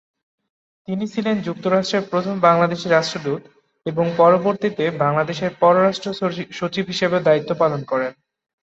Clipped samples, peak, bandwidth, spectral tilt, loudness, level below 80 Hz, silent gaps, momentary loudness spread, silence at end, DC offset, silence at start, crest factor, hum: under 0.1%; -2 dBFS; 8 kHz; -6 dB/octave; -19 LUFS; -62 dBFS; none; 11 LU; 0.5 s; under 0.1%; 0.9 s; 18 dB; none